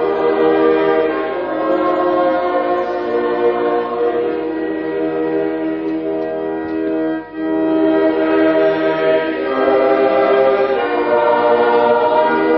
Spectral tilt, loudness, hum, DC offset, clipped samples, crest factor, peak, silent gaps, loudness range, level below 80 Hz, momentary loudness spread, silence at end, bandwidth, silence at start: -8 dB/octave; -16 LUFS; none; under 0.1%; under 0.1%; 14 dB; -2 dBFS; none; 5 LU; -52 dBFS; 7 LU; 0 s; 5.8 kHz; 0 s